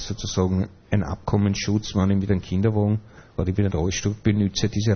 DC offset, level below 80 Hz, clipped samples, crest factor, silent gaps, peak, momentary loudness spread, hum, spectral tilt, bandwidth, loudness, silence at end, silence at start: under 0.1%; -40 dBFS; under 0.1%; 16 dB; none; -6 dBFS; 5 LU; none; -6 dB/octave; 6.6 kHz; -23 LUFS; 0 s; 0 s